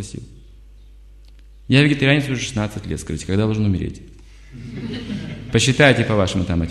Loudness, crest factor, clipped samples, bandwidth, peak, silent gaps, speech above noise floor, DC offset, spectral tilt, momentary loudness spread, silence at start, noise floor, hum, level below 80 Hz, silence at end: -19 LUFS; 20 dB; under 0.1%; 12.5 kHz; 0 dBFS; none; 25 dB; under 0.1%; -5.5 dB/octave; 18 LU; 0 s; -43 dBFS; 50 Hz at -40 dBFS; -38 dBFS; 0 s